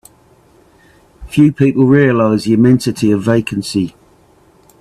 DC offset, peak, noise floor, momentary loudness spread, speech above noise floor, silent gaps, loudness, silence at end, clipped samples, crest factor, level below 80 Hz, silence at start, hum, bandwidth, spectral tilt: under 0.1%; 0 dBFS; -49 dBFS; 9 LU; 37 dB; none; -13 LUFS; 0.9 s; under 0.1%; 14 dB; -44 dBFS; 1.2 s; none; 13.5 kHz; -7 dB/octave